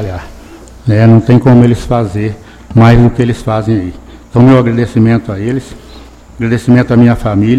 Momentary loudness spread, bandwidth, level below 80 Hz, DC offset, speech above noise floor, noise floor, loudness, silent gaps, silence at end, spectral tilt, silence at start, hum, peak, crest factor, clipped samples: 13 LU; 9.6 kHz; -28 dBFS; under 0.1%; 25 dB; -33 dBFS; -9 LUFS; none; 0 s; -8.5 dB/octave; 0 s; none; 0 dBFS; 8 dB; 1%